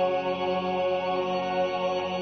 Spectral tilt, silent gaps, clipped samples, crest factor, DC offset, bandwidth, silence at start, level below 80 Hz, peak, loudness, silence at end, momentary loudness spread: -6 dB/octave; none; under 0.1%; 12 dB; under 0.1%; 6.4 kHz; 0 s; -70 dBFS; -16 dBFS; -27 LUFS; 0 s; 1 LU